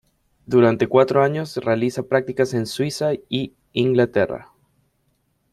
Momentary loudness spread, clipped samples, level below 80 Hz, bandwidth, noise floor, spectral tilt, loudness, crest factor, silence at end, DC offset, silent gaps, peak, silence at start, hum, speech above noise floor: 9 LU; under 0.1%; -58 dBFS; 13.5 kHz; -67 dBFS; -6.5 dB/octave; -20 LUFS; 20 dB; 1.1 s; under 0.1%; none; -2 dBFS; 0.5 s; none; 48 dB